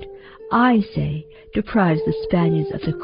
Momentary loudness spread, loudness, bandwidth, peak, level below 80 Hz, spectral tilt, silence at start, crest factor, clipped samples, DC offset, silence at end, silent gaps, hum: 13 LU; -20 LUFS; 5.4 kHz; -4 dBFS; -44 dBFS; -6.5 dB/octave; 0 s; 16 dB; under 0.1%; under 0.1%; 0 s; none; none